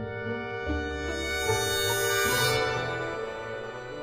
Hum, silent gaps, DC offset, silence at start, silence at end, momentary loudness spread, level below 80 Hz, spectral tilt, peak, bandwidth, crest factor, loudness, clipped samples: none; none; under 0.1%; 0 s; 0 s; 11 LU; -44 dBFS; -3 dB/octave; -14 dBFS; 15.5 kHz; 16 dB; -28 LUFS; under 0.1%